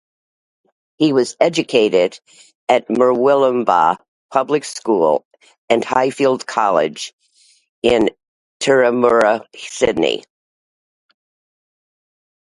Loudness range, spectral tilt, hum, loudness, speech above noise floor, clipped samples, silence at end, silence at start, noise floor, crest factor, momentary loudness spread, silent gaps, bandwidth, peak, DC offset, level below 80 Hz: 3 LU; -4.5 dB/octave; none; -16 LUFS; 40 dB; under 0.1%; 2.25 s; 1 s; -55 dBFS; 18 dB; 9 LU; 2.55-2.67 s, 4.08-4.29 s, 5.25-5.31 s, 5.58-5.68 s, 7.13-7.19 s, 7.69-7.82 s, 8.28-8.60 s; 11.5 kHz; 0 dBFS; under 0.1%; -54 dBFS